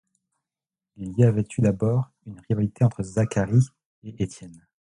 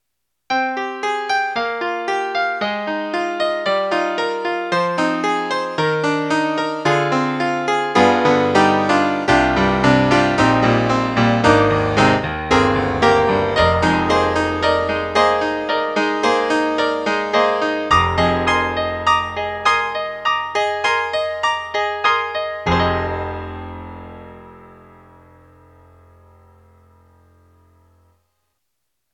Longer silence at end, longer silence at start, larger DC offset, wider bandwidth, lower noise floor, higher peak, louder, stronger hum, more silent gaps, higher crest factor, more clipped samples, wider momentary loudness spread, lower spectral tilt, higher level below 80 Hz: second, 0.45 s vs 4.4 s; first, 1 s vs 0.5 s; neither; about the same, 11 kHz vs 11 kHz; first, under -90 dBFS vs -76 dBFS; second, -6 dBFS vs 0 dBFS; second, -24 LUFS vs -17 LUFS; neither; first, 3.85-4.02 s vs none; about the same, 18 dB vs 18 dB; neither; first, 19 LU vs 8 LU; first, -8 dB/octave vs -5.5 dB/octave; second, -50 dBFS vs -40 dBFS